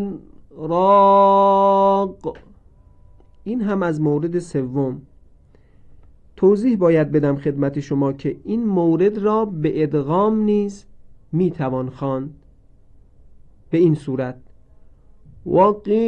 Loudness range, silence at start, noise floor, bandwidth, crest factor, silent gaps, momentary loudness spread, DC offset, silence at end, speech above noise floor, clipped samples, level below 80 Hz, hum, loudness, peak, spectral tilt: 7 LU; 0 s; -50 dBFS; 9.2 kHz; 16 dB; none; 14 LU; under 0.1%; 0 s; 32 dB; under 0.1%; -52 dBFS; none; -18 LUFS; -4 dBFS; -9 dB/octave